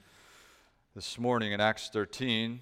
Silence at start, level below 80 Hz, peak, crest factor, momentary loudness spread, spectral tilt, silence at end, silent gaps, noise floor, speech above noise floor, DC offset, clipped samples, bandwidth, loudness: 0.95 s; -66 dBFS; -12 dBFS; 20 dB; 9 LU; -4.5 dB/octave; 0 s; none; -64 dBFS; 32 dB; under 0.1%; under 0.1%; 15 kHz; -31 LUFS